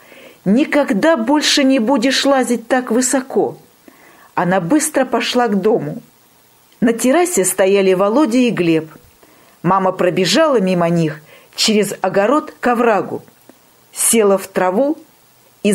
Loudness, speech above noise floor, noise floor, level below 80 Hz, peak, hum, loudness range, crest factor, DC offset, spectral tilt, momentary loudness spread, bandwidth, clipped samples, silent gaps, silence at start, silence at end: -15 LUFS; 36 dB; -50 dBFS; -58 dBFS; 0 dBFS; none; 3 LU; 16 dB; under 0.1%; -4 dB/octave; 9 LU; 16 kHz; under 0.1%; none; 0.25 s; 0 s